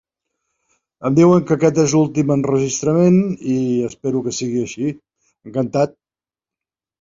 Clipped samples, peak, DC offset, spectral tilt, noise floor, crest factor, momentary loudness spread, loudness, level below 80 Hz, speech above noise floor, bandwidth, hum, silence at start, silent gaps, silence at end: under 0.1%; -2 dBFS; under 0.1%; -6.5 dB/octave; under -90 dBFS; 16 dB; 11 LU; -17 LUFS; -56 dBFS; over 74 dB; 7.8 kHz; none; 1 s; none; 1.15 s